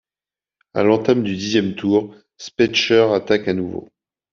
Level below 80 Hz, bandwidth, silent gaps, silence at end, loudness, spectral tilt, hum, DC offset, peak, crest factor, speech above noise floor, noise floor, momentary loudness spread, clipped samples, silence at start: -58 dBFS; 7.4 kHz; none; 0.5 s; -18 LUFS; -5 dB/octave; none; under 0.1%; -2 dBFS; 16 dB; over 72 dB; under -90 dBFS; 16 LU; under 0.1%; 0.75 s